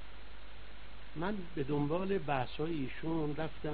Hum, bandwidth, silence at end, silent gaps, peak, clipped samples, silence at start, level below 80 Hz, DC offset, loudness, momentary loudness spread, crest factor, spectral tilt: none; 4.8 kHz; 0 s; none; -18 dBFS; under 0.1%; 0 s; -54 dBFS; 1%; -37 LUFS; 19 LU; 18 dB; -6 dB/octave